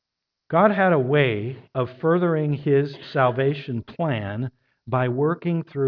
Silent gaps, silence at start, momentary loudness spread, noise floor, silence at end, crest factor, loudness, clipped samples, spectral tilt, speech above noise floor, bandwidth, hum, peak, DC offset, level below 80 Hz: none; 0.5 s; 11 LU; -82 dBFS; 0 s; 18 dB; -22 LUFS; under 0.1%; -10 dB/octave; 61 dB; 5.4 kHz; none; -4 dBFS; under 0.1%; -62 dBFS